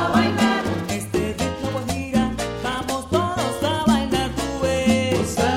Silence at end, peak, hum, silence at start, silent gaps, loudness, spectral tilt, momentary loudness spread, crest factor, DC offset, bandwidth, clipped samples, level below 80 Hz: 0 s; -6 dBFS; none; 0 s; none; -22 LUFS; -5 dB/octave; 7 LU; 16 dB; under 0.1%; 16 kHz; under 0.1%; -38 dBFS